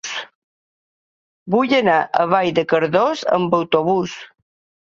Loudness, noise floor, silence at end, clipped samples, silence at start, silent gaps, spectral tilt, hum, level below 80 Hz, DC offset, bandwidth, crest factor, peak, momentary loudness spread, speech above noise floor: -18 LUFS; under -90 dBFS; 0.6 s; under 0.1%; 0.05 s; 0.35-1.46 s; -5 dB/octave; none; -62 dBFS; under 0.1%; 7.6 kHz; 18 dB; -2 dBFS; 12 LU; over 73 dB